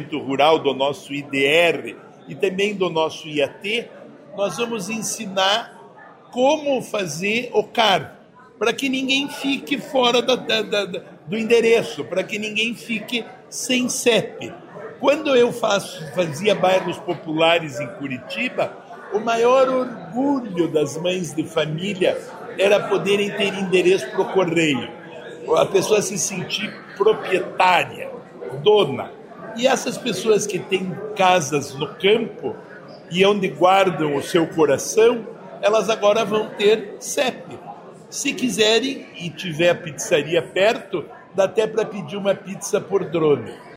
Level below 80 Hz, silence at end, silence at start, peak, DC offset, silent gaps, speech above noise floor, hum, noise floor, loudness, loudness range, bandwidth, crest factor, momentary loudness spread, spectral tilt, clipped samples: -64 dBFS; 0 s; 0 s; -2 dBFS; under 0.1%; none; 24 dB; none; -44 dBFS; -20 LUFS; 3 LU; 16 kHz; 18 dB; 13 LU; -3.5 dB/octave; under 0.1%